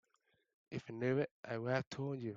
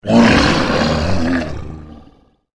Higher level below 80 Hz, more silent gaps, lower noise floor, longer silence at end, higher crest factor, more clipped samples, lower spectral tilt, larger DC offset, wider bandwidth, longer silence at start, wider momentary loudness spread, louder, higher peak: second, -76 dBFS vs -30 dBFS; first, 1.31-1.43 s, 1.87-1.91 s vs none; first, -80 dBFS vs -48 dBFS; second, 0 s vs 0.55 s; about the same, 20 dB vs 16 dB; neither; first, -7 dB/octave vs -5.5 dB/octave; neither; second, 7.6 kHz vs 11 kHz; first, 0.7 s vs 0.05 s; second, 11 LU vs 20 LU; second, -40 LUFS vs -14 LUFS; second, -22 dBFS vs 0 dBFS